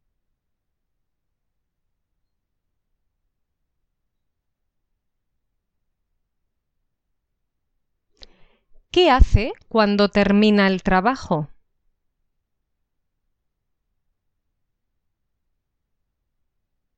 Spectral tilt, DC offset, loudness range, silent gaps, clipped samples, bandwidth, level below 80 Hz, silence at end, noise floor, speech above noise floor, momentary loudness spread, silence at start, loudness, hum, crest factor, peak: -6.5 dB/octave; under 0.1%; 9 LU; none; under 0.1%; 8 kHz; -34 dBFS; 5.5 s; -77 dBFS; 60 dB; 9 LU; 8.95 s; -18 LUFS; none; 24 dB; 0 dBFS